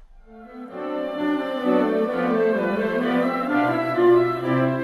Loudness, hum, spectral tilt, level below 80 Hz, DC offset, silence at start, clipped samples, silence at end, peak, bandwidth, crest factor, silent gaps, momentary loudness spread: -22 LUFS; none; -8 dB/octave; -58 dBFS; under 0.1%; 0.1 s; under 0.1%; 0 s; -6 dBFS; 12.5 kHz; 16 dB; none; 11 LU